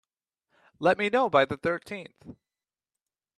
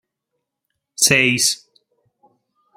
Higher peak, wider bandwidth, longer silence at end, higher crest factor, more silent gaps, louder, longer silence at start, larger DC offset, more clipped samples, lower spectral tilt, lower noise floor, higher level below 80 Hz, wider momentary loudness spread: second, -8 dBFS vs 0 dBFS; second, 12 kHz vs 16 kHz; second, 1.05 s vs 1.2 s; about the same, 22 dB vs 22 dB; neither; second, -26 LUFS vs -15 LUFS; second, 0.8 s vs 1 s; neither; neither; first, -6 dB/octave vs -1.5 dB/octave; first, under -90 dBFS vs -78 dBFS; second, -66 dBFS vs -58 dBFS; about the same, 17 LU vs 17 LU